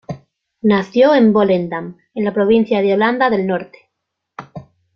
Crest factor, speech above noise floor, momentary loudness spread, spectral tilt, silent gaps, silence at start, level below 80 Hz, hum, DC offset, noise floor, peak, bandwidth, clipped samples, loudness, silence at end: 14 dB; 62 dB; 21 LU; -8 dB/octave; none; 0.1 s; -56 dBFS; none; under 0.1%; -76 dBFS; -2 dBFS; 6.6 kHz; under 0.1%; -15 LUFS; 0.35 s